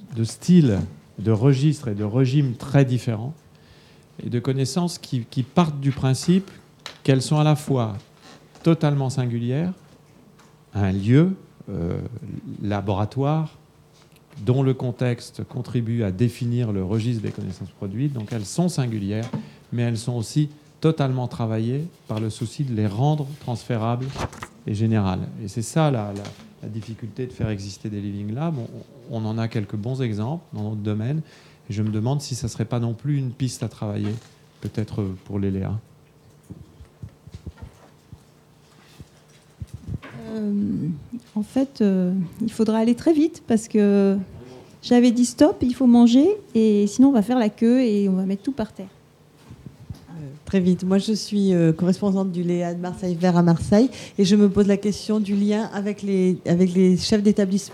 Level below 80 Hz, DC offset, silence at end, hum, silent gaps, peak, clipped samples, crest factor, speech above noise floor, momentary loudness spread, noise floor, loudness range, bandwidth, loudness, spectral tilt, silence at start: -54 dBFS; under 0.1%; 0 s; none; none; -2 dBFS; under 0.1%; 20 dB; 32 dB; 16 LU; -53 dBFS; 10 LU; 14 kHz; -22 LUFS; -7 dB/octave; 0 s